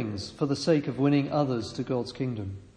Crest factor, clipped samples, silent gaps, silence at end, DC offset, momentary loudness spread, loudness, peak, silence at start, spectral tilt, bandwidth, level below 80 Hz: 18 dB; under 0.1%; none; 0.1 s; under 0.1%; 8 LU; -28 LUFS; -10 dBFS; 0 s; -6.5 dB/octave; 10 kHz; -60 dBFS